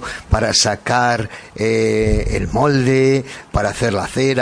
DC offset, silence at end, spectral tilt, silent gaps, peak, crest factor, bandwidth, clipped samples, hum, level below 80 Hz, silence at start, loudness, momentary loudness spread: under 0.1%; 0 s; -4.5 dB/octave; none; -2 dBFS; 14 dB; 10.5 kHz; under 0.1%; none; -28 dBFS; 0 s; -17 LUFS; 7 LU